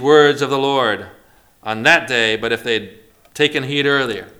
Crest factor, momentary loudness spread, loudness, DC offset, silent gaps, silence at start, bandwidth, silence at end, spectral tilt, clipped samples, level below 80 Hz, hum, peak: 18 dB; 12 LU; -16 LUFS; under 0.1%; none; 0 s; 16 kHz; 0.1 s; -4 dB/octave; under 0.1%; -56 dBFS; none; 0 dBFS